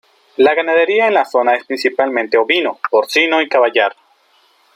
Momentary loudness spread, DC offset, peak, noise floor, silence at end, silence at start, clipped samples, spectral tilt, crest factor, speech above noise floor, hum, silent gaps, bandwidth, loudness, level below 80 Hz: 4 LU; under 0.1%; 0 dBFS; -54 dBFS; 0.85 s; 0.4 s; under 0.1%; -2.5 dB/octave; 14 dB; 41 dB; none; none; 16 kHz; -14 LUFS; -68 dBFS